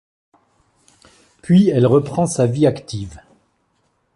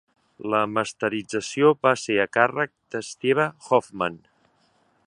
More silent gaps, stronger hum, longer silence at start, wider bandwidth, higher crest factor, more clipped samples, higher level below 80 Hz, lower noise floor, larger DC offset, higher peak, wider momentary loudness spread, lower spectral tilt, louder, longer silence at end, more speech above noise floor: neither; neither; first, 1.5 s vs 0.4 s; about the same, 11.5 kHz vs 11 kHz; second, 16 dB vs 22 dB; neither; first, -50 dBFS vs -66 dBFS; about the same, -65 dBFS vs -64 dBFS; neither; about the same, -2 dBFS vs -2 dBFS; first, 17 LU vs 9 LU; first, -7 dB/octave vs -4.5 dB/octave; first, -16 LUFS vs -23 LUFS; about the same, 1 s vs 0.9 s; first, 50 dB vs 41 dB